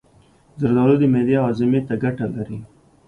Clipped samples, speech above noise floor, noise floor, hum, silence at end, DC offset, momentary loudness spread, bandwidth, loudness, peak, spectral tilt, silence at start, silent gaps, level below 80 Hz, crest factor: under 0.1%; 35 dB; -54 dBFS; none; 0.4 s; under 0.1%; 13 LU; 5.2 kHz; -19 LUFS; -4 dBFS; -10 dB/octave; 0.55 s; none; -52 dBFS; 16 dB